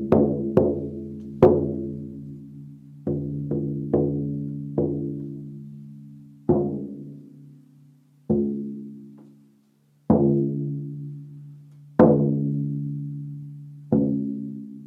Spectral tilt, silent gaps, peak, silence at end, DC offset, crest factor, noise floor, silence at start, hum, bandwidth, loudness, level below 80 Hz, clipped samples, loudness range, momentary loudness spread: -12 dB/octave; none; -2 dBFS; 0 s; under 0.1%; 24 dB; -61 dBFS; 0 s; none; 4 kHz; -24 LUFS; -52 dBFS; under 0.1%; 7 LU; 23 LU